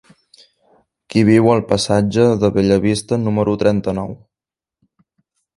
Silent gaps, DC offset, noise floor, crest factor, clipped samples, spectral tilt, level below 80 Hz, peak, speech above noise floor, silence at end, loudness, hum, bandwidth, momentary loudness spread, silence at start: none; under 0.1%; -89 dBFS; 18 dB; under 0.1%; -6.5 dB/octave; -44 dBFS; 0 dBFS; 74 dB; 1.4 s; -16 LUFS; none; 11.5 kHz; 8 LU; 1.1 s